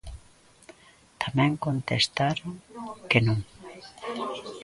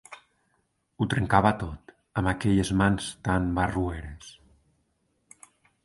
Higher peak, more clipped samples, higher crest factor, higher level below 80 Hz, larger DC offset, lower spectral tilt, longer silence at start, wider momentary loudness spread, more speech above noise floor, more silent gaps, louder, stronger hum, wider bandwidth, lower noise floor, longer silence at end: about the same, -4 dBFS vs -4 dBFS; neither; about the same, 24 dB vs 24 dB; second, -52 dBFS vs -44 dBFS; neither; about the same, -5.5 dB/octave vs -6 dB/octave; about the same, 0.05 s vs 0.1 s; about the same, 19 LU vs 21 LU; second, 31 dB vs 47 dB; neither; about the same, -27 LUFS vs -26 LUFS; neither; about the same, 11.5 kHz vs 11.5 kHz; second, -56 dBFS vs -73 dBFS; second, 0 s vs 1.55 s